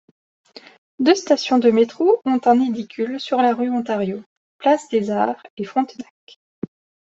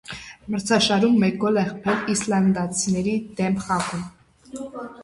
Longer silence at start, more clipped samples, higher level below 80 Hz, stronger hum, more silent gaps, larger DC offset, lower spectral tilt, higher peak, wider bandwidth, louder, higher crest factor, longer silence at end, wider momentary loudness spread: first, 1 s vs 0.1 s; neither; second, -66 dBFS vs -54 dBFS; neither; first, 4.26-4.59 s, 5.50-5.57 s vs none; neither; about the same, -5 dB/octave vs -4.5 dB/octave; first, -2 dBFS vs -6 dBFS; second, 8 kHz vs 11.5 kHz; first, -19 LUFS vs -22 LUFS; about the same, 18 dB vs 18 dB; first, 1.05 s vs 0 s; about the same, 18 LU vs 18 LU